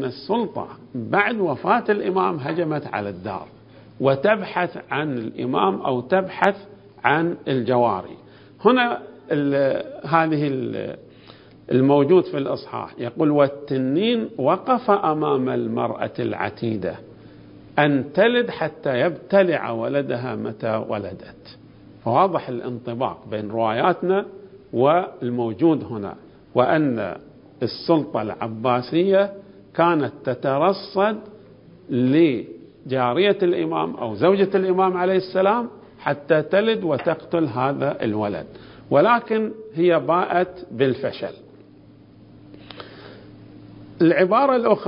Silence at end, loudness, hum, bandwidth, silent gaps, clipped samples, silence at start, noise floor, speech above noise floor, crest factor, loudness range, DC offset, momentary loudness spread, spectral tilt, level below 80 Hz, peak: 0 s; -21 LUFS; none; 5.4 kHz; none; under 0.1%; 0 s; -48 dBFS; 27 dB; 22 dB; 4 LU; under 0.1%; 12 LU; -9.5 dB/octave; -60 dBFS; 0 dBFS